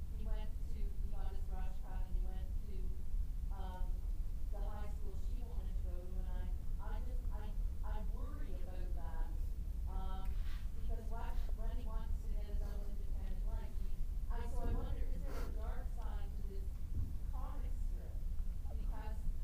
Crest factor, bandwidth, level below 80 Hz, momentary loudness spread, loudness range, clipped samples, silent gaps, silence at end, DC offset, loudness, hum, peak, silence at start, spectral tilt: 12 dB; 15 kHz; -40 dBFS; 2 LU; 1 LU; under 0.1%; none; 0 s; under 0.1%; -46 LUFS; none; -26 dBFS; 0 s; -7 dB/octave